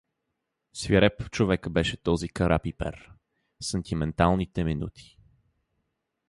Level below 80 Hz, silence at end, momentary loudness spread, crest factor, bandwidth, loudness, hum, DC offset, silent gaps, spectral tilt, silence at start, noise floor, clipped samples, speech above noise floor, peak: -42 dBFS; 1.25 s; 14 LU; 20 dB; 11.5 kHz; -27 LUFS; none; under 0.1%; none; -6 dB/octave; 0.75 s; -81 dBFS; under 0.1%; 55 dB; -8 dBFS